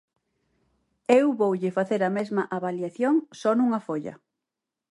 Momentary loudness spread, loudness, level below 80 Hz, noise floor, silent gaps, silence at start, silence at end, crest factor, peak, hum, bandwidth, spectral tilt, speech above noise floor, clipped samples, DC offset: 11 LU; -25 LUFS; -76 dBFS; -87 dBFS; none; 1.1 s; 0.75 s; 20 dB; -6 dBFS; none; 11.5 kHz; -7 dB/octave; 63 dB; under 0.1%; under 0.1%